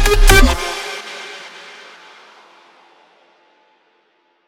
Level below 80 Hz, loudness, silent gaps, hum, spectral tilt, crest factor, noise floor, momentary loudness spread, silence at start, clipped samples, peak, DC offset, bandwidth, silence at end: -20 dBFS; -15 LUFS; none; none; -3.5 dB/octave; 18 dB; -60 dBFS; 27 LU; 0 s; under 0.1%; 0 dBFS; under 0.1%; 17 kHz; 3 s